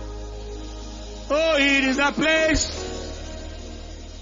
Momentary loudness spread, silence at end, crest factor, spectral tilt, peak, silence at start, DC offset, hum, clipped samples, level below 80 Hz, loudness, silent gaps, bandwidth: 19 LU; 0 s; 18 dB; -3 dB/octave; -6 dBFS; 0 s; under 0.1%; none; under 0.1%; -36 dBFS; -20 LUFS; none; 7.6 kHz